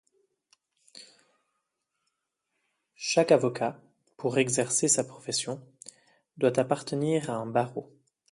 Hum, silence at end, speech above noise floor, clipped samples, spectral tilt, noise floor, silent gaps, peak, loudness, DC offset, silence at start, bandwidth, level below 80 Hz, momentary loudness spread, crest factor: none; 0.5 s; 55 dB; under 0.1%; -4 dB/octave; -82 dBFS; none; -8 dBFS; -27 LUFS; under 0.1%; 0.95 s; 11.5 kHz; -74 dBFS; 15 LU; 24 dB